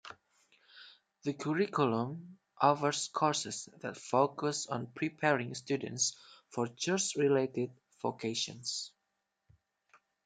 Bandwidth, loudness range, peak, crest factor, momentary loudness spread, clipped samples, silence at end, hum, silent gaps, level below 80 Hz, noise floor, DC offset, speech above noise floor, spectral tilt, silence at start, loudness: 10 kHz; 2 LU; -12 dBFS; 24 dB; 13 LU; under 0.1%; 1.35 s; none; none; -80 dBFS; -84 dBFS; under 0.1%; 51 dB; -4 dB/octave; 0.05 s; -34 LUFS